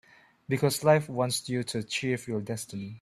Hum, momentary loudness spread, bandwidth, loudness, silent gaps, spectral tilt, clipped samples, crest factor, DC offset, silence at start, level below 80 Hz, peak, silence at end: none; 11 LU; 14.5 kHz; -29 LUFS; none; -5 dB/octave; under 0.1%; 22 dB; under 0.1%; 0.5 s; -66 dBFS; -8 dBFS; 0.05 s